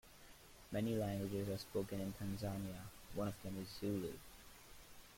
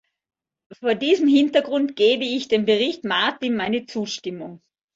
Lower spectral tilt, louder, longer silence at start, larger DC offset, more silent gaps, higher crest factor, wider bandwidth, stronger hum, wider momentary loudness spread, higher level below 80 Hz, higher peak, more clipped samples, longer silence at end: first, -6 dB/octave vs -4.5 dB/octave; second, -44 LUFS vs -21 LUFS; second, 0.05 s vs 0.7 s; neither; neither; about the same, 16 dB vs 18 dB; first, 16.5 kHz vs 7.8 kHz; neither; first, 19 LU vs 12 LU; about the same, -64 dBFS vs -66 dBFS; second, -28 dBFS vs -4 dBFS; neither; second, 0 s vs 0.4 s